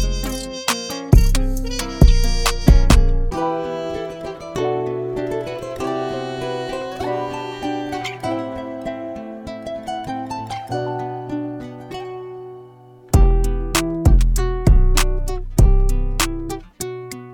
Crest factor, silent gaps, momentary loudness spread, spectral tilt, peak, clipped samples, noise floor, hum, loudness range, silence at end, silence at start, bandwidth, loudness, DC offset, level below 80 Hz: 18 dB; none; 15 LU; -5.5 dB/octave; 0 dBFS; under 0.1%; -43 dBFS; none; 10 LU; 0 s; 0 s; 18.5 kHz; -21 LUFS; under 0.1%; -20 dBFS